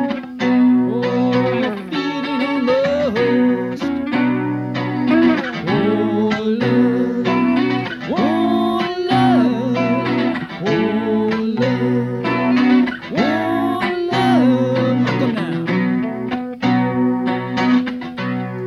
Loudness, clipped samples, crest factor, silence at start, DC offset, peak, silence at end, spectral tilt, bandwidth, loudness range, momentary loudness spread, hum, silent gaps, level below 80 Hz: -17 LUFS; under 0.1%; 12 dB; 0 s; under 0.1%; -4 dBFS; 0 s; -7.5 dB/octave; 6.8 kHz; 2 LU; 7 LU; none; none; -52 dBFS